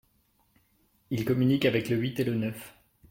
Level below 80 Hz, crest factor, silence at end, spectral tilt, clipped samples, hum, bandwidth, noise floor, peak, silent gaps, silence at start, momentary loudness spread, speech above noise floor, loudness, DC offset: -62 dBFS; 20 dB; 0.4 s; -7 dB/octave; under 0.1%; none; 16.5 kHz; -69 dBFS; -10 dBFS; none; 1.1 s; 13 LU; 42 dB; -28 LUFS; under 0.1%